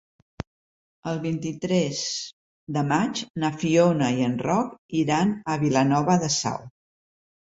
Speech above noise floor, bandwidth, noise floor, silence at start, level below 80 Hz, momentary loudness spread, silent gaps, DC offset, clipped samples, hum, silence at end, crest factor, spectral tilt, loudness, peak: over 67 dB; 8 kHz; under -90 dBFS; 0.4 s; -58 dBFS; 15 LU; 0.47-1.03 s, 2.33-2.67 s, 3.30-3.34 s, 4.78-4.89 s; under 0.1%; under 0.1%; none; 0.9 s; 18 dB; -5 dB/octave; -24 LUFS; -6 dBFS